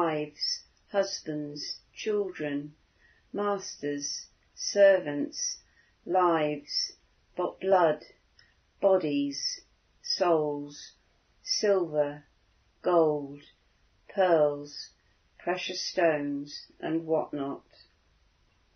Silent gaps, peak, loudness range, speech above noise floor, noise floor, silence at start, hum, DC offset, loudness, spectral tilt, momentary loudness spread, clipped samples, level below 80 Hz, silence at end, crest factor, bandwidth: none; -10 dBFS; 5 LU; 39 dB; -67 dBFS; 0 s; none; under 0.1%; -29 LUFS; -3.5 dB/octave; 18 LU; under 0.1%; -72 dBFS; 1.15 s; 20 dB; 6.6 kHz